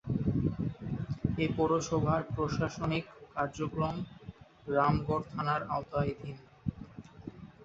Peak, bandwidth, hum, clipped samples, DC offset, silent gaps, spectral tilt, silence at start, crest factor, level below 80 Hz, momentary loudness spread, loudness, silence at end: -14 dBFS; 7.8 kHz; none; under 0.1%; under 0.1%; none; -7 dB/octave; 0.05 s; 20 dB; -50 dBFS; 19 LU; -33 LUFS; 0 s